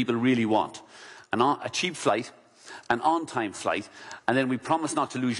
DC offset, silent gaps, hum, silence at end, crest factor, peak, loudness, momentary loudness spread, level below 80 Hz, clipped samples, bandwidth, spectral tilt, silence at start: under 0.1%; none; none; 0 s; 18 dB; -10 dBFS; -27 LUFS; 19 LU; -68 dBFS; under 0.1%; 11.5 kHz; -4.5 dB/octave; 0 s